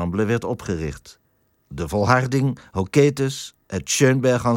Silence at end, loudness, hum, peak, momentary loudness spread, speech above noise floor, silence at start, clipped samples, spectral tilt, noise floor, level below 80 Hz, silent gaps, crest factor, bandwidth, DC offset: 0 s; -21 LUFS; none; -2 dBFS; 14 LU; 30 dB; 0 s; under 0.1%; -5.5 dB/octave; -51 dBFS; -48 dBFS; none; 20 dB; 16.5 kHz; under 0.1%